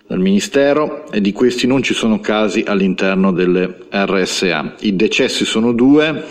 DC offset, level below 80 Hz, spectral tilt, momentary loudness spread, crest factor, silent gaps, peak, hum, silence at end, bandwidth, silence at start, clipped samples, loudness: under 0.1%; -46 dBFS; -5 dB/octave; 5 LU; 12 dB; none; -2 dBFS; none; 0 s; 12.5 kHz; 0.1 s; under 0.1%; -15 LUFS